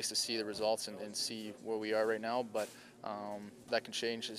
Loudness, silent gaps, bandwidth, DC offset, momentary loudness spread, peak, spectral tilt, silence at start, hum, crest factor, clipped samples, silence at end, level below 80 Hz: -37 LUFS; none; 15.5 kHz; under 0.1%; 11 LU; -20 dBFS; -2 dB/octave; 0 s; none; 18 dB; under 0.1%; 0 s; -80 dBFS